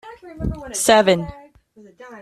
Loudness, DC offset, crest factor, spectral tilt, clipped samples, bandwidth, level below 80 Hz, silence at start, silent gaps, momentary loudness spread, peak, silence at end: -18 LUFS; under 0.1%; 20 dB; -3.5 dB/octave; under 0.1%; 13.5 kHz; -38 dBFS; 0.05 s; none; 19 LU; -2 dBFS; 0 s